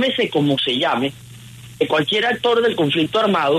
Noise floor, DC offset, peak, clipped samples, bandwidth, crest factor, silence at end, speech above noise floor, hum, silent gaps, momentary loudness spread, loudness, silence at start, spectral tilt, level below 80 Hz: -39 dBFS; under 0.1%; -6 dBFS; under 0.1%; 13.5 kHz; 14 dB; 0 s; 21 dB; none; none; 4 LU; -18 LUFS; 0 s; -5.5 dB/octave; -58 dBFS